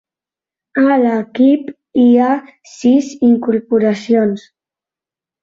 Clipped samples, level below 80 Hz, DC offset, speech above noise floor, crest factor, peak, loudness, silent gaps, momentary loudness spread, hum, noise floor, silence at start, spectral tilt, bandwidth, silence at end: under 0.1%; -60 dBFS; under 0.1%; 76 dB; 12 dB; -2 dBFS; -14 LUFS; none; 8 LU; none; -89 dBFS; 0.75 s; -6.5 dB/octave; 7.6 kHz; 1.05 s